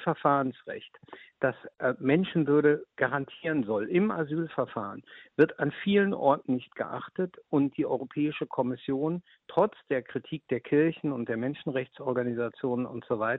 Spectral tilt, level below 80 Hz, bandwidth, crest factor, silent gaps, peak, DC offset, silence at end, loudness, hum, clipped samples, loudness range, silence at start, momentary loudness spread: -5.5 dB/octave; -70 dBFS; 4.1 kHz; 20 dB; none; -10 dBFS; under 0.1%; 0 s; -29 LUFS; none; under 0.1%; 3 LU; 0 s; 10 LU